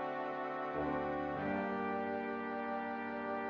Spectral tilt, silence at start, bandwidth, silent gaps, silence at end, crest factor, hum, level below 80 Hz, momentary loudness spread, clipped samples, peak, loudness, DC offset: -5 dB/octave; 0 s; 7 kHz; none; 0 s; 14 dB; none; -66 dBFS; 3 LU; under 0.1%; -24 dBFS; -39 LUFS; under 0.1%